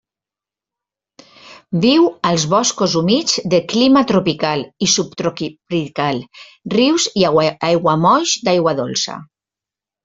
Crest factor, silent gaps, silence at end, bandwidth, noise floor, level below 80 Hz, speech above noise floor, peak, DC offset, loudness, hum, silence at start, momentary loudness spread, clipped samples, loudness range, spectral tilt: 16 dB; none; 0.8 s; 7.8 kHz; -88 dBFS; -56 dBFS; 73 dB; -2 dBFS; under 0.1%; -16 LUFS; none; 1.45 s; 9 LU; under 0.1%; 3 LU; -4 dB/octave